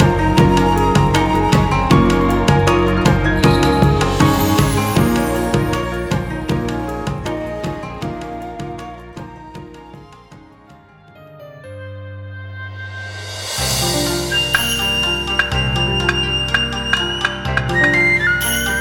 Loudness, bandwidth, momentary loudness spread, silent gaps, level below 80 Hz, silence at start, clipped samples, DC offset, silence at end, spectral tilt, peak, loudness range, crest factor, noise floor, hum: -16 LUFS; over 20 kHz; 19 LU; none; -28 dBFS; 0 s; under 0.1%; under 0.1%; 0 s; -4.5 dB/octave; 0 dBFS; 20 LU; 16 dB; -44 dBFS; none